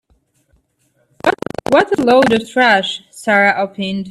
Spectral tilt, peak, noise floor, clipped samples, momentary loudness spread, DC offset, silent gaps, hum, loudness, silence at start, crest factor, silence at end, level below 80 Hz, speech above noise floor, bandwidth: -4.5 dB/octave; 0 dBFS; -61 dBFS; under 0.1%; 11 LU; under 0.1%; none; none; -14 LUFS; 1.25 s; 16 dB; 0 s; -52 dBFS; 48 dB; 13.5 kHz